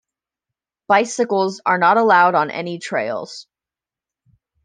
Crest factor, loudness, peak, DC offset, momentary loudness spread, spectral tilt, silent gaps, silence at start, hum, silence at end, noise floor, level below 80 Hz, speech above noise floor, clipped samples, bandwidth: 18 dB; -17 LUFS; -2 dBFS; under 0.1%; 14 LU; -4 dB/octave; none; 0.9 s; none; 1.2 s; -89 dBFS; -72 dBFS; 72 dB; under 0.1%; 10 kHz